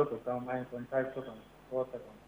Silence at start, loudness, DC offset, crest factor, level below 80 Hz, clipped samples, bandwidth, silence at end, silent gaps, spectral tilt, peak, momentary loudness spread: 0 s; -37 LUFS; under 0.1%; 20 dB; -66 dBFS; under 0.1%; 19.5 kHz; 0 s; none; -8 dB/octave; -16 dBFS; 10 LU